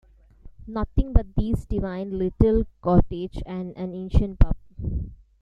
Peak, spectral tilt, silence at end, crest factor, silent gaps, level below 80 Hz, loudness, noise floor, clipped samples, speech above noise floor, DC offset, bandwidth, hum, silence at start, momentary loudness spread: -2 dBFS; -10 dB/octave; 0.25 s; 20 dB; none; -28 dBFS; -26 LUFS; -47 dBFS; under 0.1%; 25 dB; under 0.1%; 5.2 kHz; none; 0.45 s; 12 LU